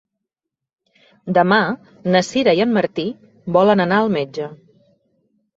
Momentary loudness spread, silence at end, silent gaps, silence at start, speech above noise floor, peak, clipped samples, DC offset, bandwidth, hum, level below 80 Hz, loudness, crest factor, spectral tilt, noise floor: 14 LU; 1 s; none; 1.25 s; 67 dB; -2 dBFS; under 0.1%; under 0.1%; 8 kHz; none; -60 dBFS; -17 LUFS; 18 dB; -6 dB/octave; -84 dBFS